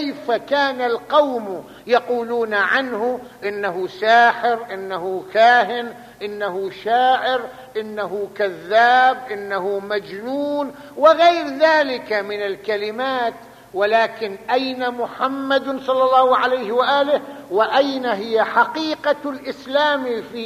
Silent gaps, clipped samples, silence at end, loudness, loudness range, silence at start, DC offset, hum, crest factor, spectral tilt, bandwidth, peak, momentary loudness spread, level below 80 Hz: none; under 0.1%; 0 s; -19 LUFS; 3 LU; 0 s; under 0.1%; none; 18 dB; -4 dB/octave; 15 kHz; -2 dBFS; 12 LU; -64 dBFS